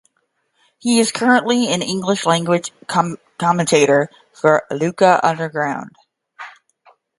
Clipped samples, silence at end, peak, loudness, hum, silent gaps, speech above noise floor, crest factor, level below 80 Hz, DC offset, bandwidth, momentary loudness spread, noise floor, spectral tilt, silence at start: under 0.1%; 0.7 s; 0 dBFS; -17 LUFS; none; none; 51 dB; 18 dB; -64 dBFS; under 0.1%; 11.5 kHz; 13 LU; -68 dBFS; -4.5 dB/octave; 0.85 s